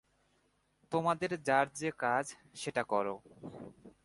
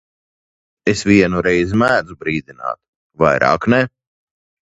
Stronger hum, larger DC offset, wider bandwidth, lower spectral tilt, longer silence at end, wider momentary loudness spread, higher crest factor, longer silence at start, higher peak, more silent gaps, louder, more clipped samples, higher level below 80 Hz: first, 50 Hz at -70 dBFS vs none; neither; about the same, 11.5 kHz vs 10.5 kHz; second, -4.5 dB/octave vs -6 dB/octave; second, 0.15 s vs 0.9 s; first, 18 LU vs 13 LU; about the same, 22 dB vs 18 dB; about the same, 0.9 s vs 0.85 s; second, -14 dBFS vs 0 dBFS; second, none vs 2.88-3.10 s; second, -34 LUFS vs -16 LUFS; neither; second, -74 dBFS vs -44 dBFS